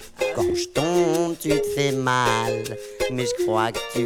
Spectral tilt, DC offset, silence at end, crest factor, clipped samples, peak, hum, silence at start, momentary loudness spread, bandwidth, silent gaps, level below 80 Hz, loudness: -4.5 dB/octave; under 0.1%; 0 s; 16 dB; under 0.1%; -6 dBFS; none; 0 s; 6 LU; 18 kHz; none; -48 dBFS; -23 LUFS